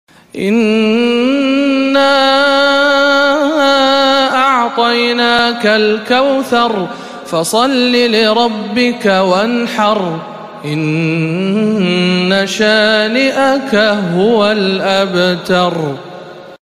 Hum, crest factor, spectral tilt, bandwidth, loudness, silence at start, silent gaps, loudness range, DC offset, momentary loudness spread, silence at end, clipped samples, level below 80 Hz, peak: none; 12 dB; -5 dB/octave; 15.5 kHz; -11 LUFS; 0.35 s; none; 4 LU; 0.3%; 8 LU; 0.1 s; under 0.1%; -54 dBFS; 0 dBFS